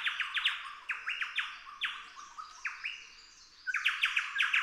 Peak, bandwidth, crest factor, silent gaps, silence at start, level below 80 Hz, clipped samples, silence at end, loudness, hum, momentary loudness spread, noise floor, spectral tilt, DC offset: -16 dBFS; 15.5 kHz; 20 dB; none; 0 s; -74 dBFS; under 0.1%; 0 s; -34 LUFS; none; 18 LU; -56 dBFS; 3.5 dB/octave; under 0.1%